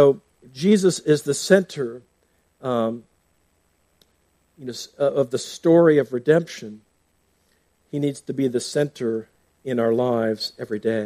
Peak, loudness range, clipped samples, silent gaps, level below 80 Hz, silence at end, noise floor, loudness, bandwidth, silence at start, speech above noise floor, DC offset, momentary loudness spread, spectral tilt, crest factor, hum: -2 dBFS; 6 LU; under 0.1%; none; -68 dBFS; 0 s; -66 dBFS; -21 LUFS; 15 kHz; 0 s; 45 dB; under 0.1%; 16 LU; -5.5 dB/octave; 20 dB; none